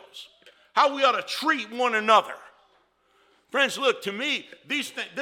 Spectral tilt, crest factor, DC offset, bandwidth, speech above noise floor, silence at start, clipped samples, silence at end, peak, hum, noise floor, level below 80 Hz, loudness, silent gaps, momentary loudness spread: -2 dB/octave; 22 dB; under 0.1%; 17.5 kHz; 40 dB; 0.15 s; under 0.1%; 0 s; -6 dBFS; none; -65 dBFS; -82 dBFS; -24 LUFS; none; 13 LU